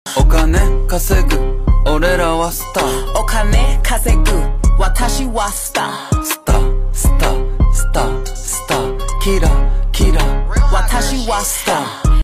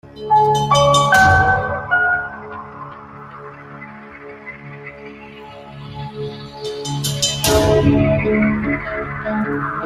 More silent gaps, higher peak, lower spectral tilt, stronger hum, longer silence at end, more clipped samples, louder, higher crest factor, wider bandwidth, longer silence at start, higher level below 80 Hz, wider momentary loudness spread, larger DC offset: neither; about the same, -2 dBFS vs -2 dBFS; about the same, -4.5 dB/octave vs -4.5 dB/octave; neither; about the same, 0 s vs 0 s; neither; about the same, -16 LUFS vs -16 LUFS; second, 10 dB vs 18 dB; about the same, 15.5 kHz vs 15.5 kHz; about the same, 0.05 s vs 0.05 s; first, -14 dBFS vs -38 dBFS; second, 4 LU vs 23 LU; neither